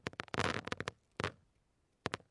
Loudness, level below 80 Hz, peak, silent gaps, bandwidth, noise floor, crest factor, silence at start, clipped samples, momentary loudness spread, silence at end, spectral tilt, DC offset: -41 LUFS; -66 dBFS; -14 dBFS; none; 11.5 kHz; -77 dBFS; 28 dB; 0.05 s; under 0.1%; 7 LU; 0.15 s; -4 dB/octave; under 0.1%